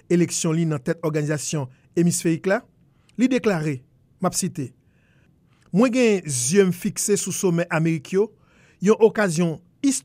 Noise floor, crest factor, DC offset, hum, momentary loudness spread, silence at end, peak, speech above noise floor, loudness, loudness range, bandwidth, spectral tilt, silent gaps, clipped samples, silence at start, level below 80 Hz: -58 dBFS; 18 dB; under 0.1%; none; 10 LU; 0.05 s; -4 dBFS; 37 dB; -22 LUFS; 4 LU; 16 kHz; -5 dB/octave; none; under 0.1%; 0.1 s; -62 dBFS